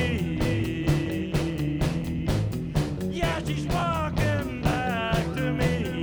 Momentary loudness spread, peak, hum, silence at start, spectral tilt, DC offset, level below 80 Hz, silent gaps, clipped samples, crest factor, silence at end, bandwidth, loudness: 2 LU; -10 dBFS; none; 0 s; -6.5 dB/octave; under 0.1%; -36 dBFS; none; under 0.1%; 16 dB; 0 s; over 20 kHz; -27 LUFS